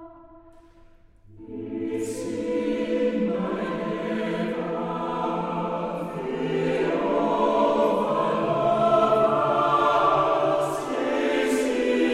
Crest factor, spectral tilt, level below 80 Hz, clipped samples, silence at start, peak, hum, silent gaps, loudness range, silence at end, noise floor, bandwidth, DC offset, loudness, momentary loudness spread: 16 dB; -6 dB/octave; -56 dBFS; under 0.1%; 0 s; -8 dBFS; none; none; 7 LU; 0 s; -52 dBFS; 14.5 kHz; under 0.1%; -24 LUFS; 9 LU